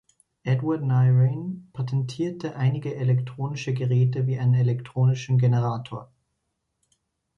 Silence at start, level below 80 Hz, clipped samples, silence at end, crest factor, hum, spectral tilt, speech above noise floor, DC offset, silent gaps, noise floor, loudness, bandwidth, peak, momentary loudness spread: 0.45 s; -62 dBFS; under 0.1%; 1.35 s; 12 dB; none; -8.5 dB/octave; 54 dB; under 0.1%; none; -77 dBFS; -24 LUFS; 6.8 kHz; -12 dBFS; 12 LU